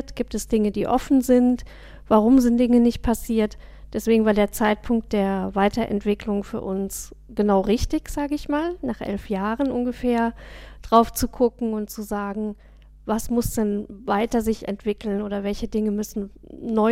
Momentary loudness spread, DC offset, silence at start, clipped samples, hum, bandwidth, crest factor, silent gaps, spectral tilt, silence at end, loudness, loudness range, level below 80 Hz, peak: 11 LU; under 0.1%; 0 s; under 0.1%; none; 16.5 kHz; 18 dB; none; -6 dB/octave; 0 s; -23 LUFS; 6 LU; -40 dBFS; -4 dBFS